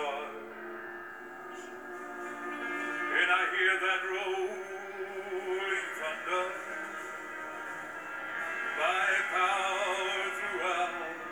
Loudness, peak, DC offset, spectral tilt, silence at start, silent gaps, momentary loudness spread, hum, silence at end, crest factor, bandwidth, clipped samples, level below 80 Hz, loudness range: -32 LUFS; -14 dBFS; under 0.1%; -1.5 dB/octave; 0 s; none; 16 LU; none; 0 s; 20 dB; over 20 kHz; under 0.1%; -78 dBFS; 5 LU